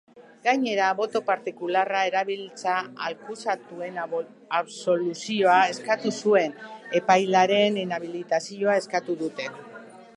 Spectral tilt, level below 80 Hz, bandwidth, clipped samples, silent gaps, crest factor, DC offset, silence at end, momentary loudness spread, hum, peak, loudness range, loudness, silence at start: -4 dB/octave; -80 dBFS; 11 kHz; under 0.1%; none; 20 dB; under 0.1%; 0.1 s; 12 LU; none; -4 dBFS; 6 LU; -25 LUFS; 0.15 s